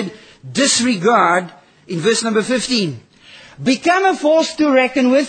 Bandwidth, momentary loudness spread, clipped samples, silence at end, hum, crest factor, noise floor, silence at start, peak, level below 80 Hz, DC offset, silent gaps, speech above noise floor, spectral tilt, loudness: 9.8 kHz; 11 LU; under 0.1%; 0 s; none; 16 dB; -43 dBFS; 0 s; -2 dBFS; -58 dBFS; under 0.1%; none; 27 dB; -3.5 dB/octave; -15 LUFS